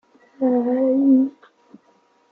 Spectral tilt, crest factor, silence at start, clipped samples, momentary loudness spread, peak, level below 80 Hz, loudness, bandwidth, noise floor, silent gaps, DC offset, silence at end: -9.5 dB/octave; 14 dB; 0.4 s; under 0.1%; 8 LU; -6 dBFS; -78 dBFS; -19 LUFS; 2.4 kHz; -59 dBFS; none; under 0.1%; 1 s